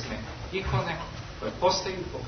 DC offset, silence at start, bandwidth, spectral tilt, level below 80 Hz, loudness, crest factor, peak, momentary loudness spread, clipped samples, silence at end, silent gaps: under 0.1%; 0 s; 6.6 kHz; -4.5 dB/octave; -44 dBFS; -30 LUFS; 18 dB; -12 dBFS; 10 LU; under 0.1%; 0 s; none